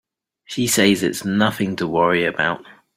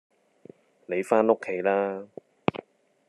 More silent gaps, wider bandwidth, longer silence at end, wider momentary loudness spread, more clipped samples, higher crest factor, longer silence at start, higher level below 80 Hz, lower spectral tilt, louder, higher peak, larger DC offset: neither; first, 16 kHz vs 12 kHz; second, 0.25 s vs 0.5 s; second, 8 LU vs 17 LU; neither; second, 18 dB vs 26 dB; second, 0.5 s vs 0.9 s; first, -56 dBFS vs -74 dBFS; second, -4 dB/octave vs -6.5 dB/octave; first, -19 LUFS vs -26 LUFS; about the same, -2 dBFS vs -4 dBFS; neither